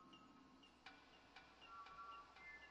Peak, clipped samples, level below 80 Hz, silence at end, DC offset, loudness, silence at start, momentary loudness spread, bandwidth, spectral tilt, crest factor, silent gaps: -44 dBFS; under 0.1%; -82 dBFS; 0 s; under 0.1%; -61 LUFS; 0 s; 9 LU; 8.2 kHz; -3 dB/octave; 18 dB; none